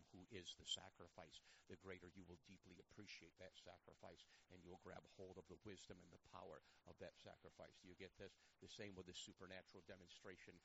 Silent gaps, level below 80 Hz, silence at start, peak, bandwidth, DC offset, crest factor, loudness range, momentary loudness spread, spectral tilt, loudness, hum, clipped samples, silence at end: none; -82 dBFS; 0 s; -36 dBFS; 7.6 kHz; under 0.1%; 26 dB; 6 LU; 9 LU; -2.5 dB/octave; -61 LUFS; none; under 0.1%; 0 s